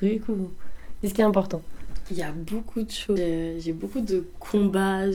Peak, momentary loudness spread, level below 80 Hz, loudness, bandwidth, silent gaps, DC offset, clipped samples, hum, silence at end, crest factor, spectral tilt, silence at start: -8 dBFS; 12 LU; -42 dBFS; -27 LUFS; 17.5 kHz; none; under 0.1%; under 0.1%; none; 0 s; 18 dB; -6.5 dB/octave; 0 s